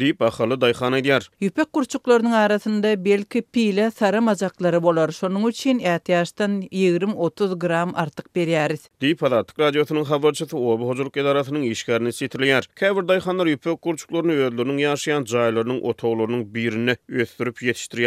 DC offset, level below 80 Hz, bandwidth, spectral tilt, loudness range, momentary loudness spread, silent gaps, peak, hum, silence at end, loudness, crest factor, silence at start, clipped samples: under 0.1%; -66 dBFS; 15 kHz; -5.5 dB/octave; 2 LU; 6 LU; none; -4 dBFS; none; 0 s; -21 LUFS; 16 dB; 0 s; under 0.1%